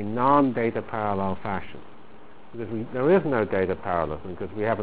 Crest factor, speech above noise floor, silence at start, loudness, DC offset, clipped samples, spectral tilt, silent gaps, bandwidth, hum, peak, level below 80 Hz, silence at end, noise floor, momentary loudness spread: 20 dB; 25 dB; 0 s; -25 LUFS; 1%; under 0.1%; -11 dB/octave; none; 4 kHz; none; -6 dBFS; -50 dBFS; 0 s; -50 dBFS; 14 LU